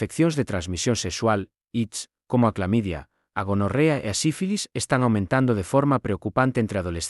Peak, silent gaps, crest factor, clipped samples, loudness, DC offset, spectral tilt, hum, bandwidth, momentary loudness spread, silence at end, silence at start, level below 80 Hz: -6 dBFS; none; 18 dB; under 0.1%; -24 LUFS; under 0.1%; -5.5 dB/octave; none; 12 kHz; 8 LU; 0 s; 0 s; -52 dBFS